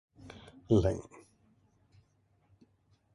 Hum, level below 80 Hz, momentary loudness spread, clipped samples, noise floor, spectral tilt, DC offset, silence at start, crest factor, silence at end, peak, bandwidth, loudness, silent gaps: none; -50 dBFS; 25 LU; under 0.1%; -71 dBFS; -8 dB/octave; under 0.1%; 0.25 s; 24 dB; 2.15 s; -14 dBFS; 11.5 kHz; -31 LUFS; none